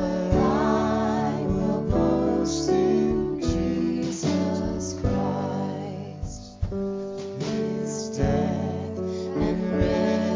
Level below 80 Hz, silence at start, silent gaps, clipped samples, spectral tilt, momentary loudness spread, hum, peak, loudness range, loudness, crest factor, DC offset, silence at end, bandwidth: -38 dBFS; 0 s; none; under 0.1%; -6.5 dB/octave; 9 LU; none; -8 dBFS; 6 LU; -25 LUFS; 16 dB; under 0.1%; 0 s; 7.6 kHz